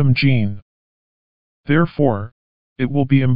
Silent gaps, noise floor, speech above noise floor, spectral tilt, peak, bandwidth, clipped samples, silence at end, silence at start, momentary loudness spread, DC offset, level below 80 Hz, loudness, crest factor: 0.62-1.64 s, 2.32-2.76 s; under -90 dBFS; over 74 dB; -10.5 dB/octave; -2 dBFS; 5.4 kHz; under 0.1%; 0 s; 0 s; 19 LU; under 0.1%; -48 dBFS; -18 LUFS; 16 dB